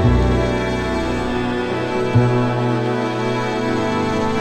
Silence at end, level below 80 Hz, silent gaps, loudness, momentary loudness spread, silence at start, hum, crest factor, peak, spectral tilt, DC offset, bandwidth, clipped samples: 0 s; -28 dBFS; none; -19 LUFS; 5 LU; 0 s; none; 16 dB; -2 dBFS; -7 dB/octave; under 0.1%; 9.4 kHz; under 0.1%